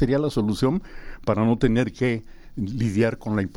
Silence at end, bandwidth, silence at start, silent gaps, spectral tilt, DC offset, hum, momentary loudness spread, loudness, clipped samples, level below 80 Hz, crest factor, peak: 0 s; 12.5 kHz; 0 s; none; -7.5 dB/octave; under 0.1%; none; 11 LU; -24 LUFS; under 0.1%; -40 dBFS; 16 dB; -6 dBFS